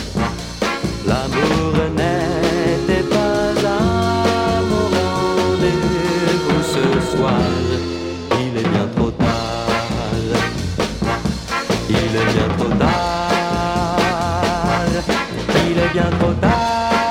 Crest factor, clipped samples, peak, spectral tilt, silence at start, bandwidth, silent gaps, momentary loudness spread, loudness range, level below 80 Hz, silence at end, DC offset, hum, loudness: 16 dB; under 0.1%; 0 dBFS; -5.5 dB/octave; 0 s; 16.5 kHz; none; 4 LU; 2 LU; -32 dBFS; 0 s; under 0.1%; none; -18 LUFS